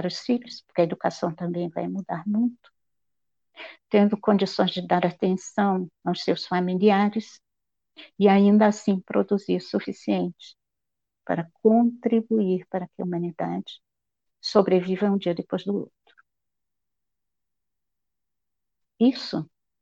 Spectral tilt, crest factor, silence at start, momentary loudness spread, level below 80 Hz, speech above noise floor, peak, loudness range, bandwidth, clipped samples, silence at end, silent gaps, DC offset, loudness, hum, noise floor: -7 dB/octave; 20 dB; 0 s; 11 LU; -72 dBFS; 64 dB; -6 dBFS; 8 LU; 7.6 kHz; under 0.1%; 0.4 s; none; under 0.1%; -24 LUFS; none; -88 dBFS